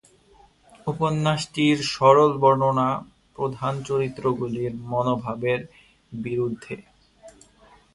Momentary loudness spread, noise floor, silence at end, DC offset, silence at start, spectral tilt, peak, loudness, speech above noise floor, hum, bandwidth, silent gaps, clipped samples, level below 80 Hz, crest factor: 15 LU; -56 dBFS; 0.65 s; under 0.1%; 0.85 s; -6 dB/octave; -2 dBFS; -23 LUFS; 33 dB; none; 11.5 kHz; none; under 0.1%; -58 dBFS; 22 dB